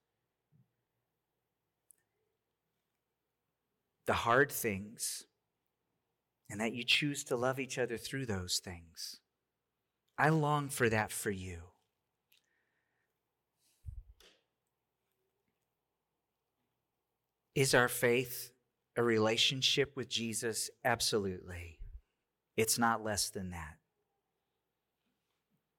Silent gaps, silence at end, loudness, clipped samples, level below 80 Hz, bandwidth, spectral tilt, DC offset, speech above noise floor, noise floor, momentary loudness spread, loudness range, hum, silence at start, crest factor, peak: none; 2.05 s; -33 LUFS; under 0.1%; -64 dBFS; 18 kHz; -3.5 dB/octave; under 0.1%; 54 dB; -88 dBFS; 19 LU; 6 LU; none; 4.05 s; 26 dB; -12 dBFS